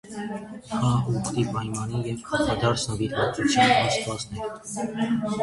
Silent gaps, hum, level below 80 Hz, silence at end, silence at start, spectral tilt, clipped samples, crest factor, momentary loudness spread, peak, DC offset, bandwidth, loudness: none; none; -48 dBFS; 0 s; 0.05 s; -5 dB/octave; under 0.1%; 18 dB; 13 LU; -6 dBFS; under 0.1%; 11.5 kHz; -25 LUFS